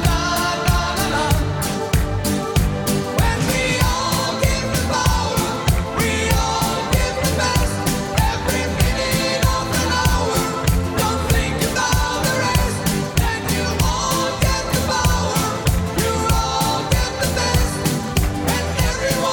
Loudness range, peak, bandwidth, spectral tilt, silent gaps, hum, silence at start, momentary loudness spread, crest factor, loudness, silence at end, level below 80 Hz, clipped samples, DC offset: 1 LU; -2 dBFS; 19 kHz; -4 dB/octave; none; none; 0 s; 2 LU; 16 dB; -19 LUFS; 0 s; -26 dBFS; under 0.1%; under 0.1%